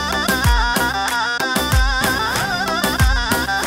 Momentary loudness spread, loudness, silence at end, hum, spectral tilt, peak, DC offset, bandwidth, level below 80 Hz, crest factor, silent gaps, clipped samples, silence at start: 3 LU; -17 LUFS; 0 s; none; -3.5 dB/octave; -4 dBFS; under 0.1%; 16.5 kHz; -24 dBFS; 14 dB; none; under 0.1%; 0 s